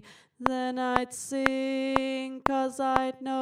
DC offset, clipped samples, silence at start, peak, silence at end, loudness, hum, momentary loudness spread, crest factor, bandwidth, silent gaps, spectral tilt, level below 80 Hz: under 0.1%; under 0.1%; 0.05 s; 0 dBFS; 0 s; -29 LUFS; none; 4 LU; 28 dB; 15 kHz; none; -4 dB/octave; -54 dBFS